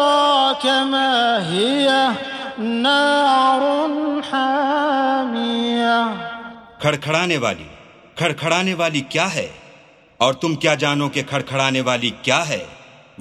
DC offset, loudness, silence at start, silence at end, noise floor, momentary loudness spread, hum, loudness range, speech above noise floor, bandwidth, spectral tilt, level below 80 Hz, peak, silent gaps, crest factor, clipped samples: under 0.1%; -18 LUFS; 0 s; 0.35 s; -48 dBFS; 11 LU; none; 4 LU; 30 dB; 13.5 kHz; -4 dB/octave; -58 dBFS; -2 dBFS; none; 18 dB; under 0.1%